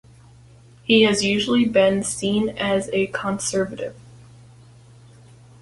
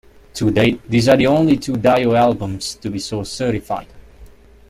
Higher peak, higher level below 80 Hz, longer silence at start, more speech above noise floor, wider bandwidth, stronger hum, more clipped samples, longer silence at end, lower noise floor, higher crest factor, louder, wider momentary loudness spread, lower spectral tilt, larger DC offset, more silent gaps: about the same, -4 dBFS vs -2 dBFS; second, -54 dBFS vs -44 dBFS; first, 0.9 s vs 0.35 s; about the same, 28 dB vs 26 dB; second, 11.5 kHz vs 15.5 kHz; neither; neither; first, 1.6 s vs 0.45 s; first, -48 dBFS vs -42 dBFS; about the same, 18 dB vs 16 dB; second, -20 LUFS vs -17 LUFS; about the same, 11 LU vs 12 LU; second, -4 dB/octave vs -6 dB/octave; neither; neither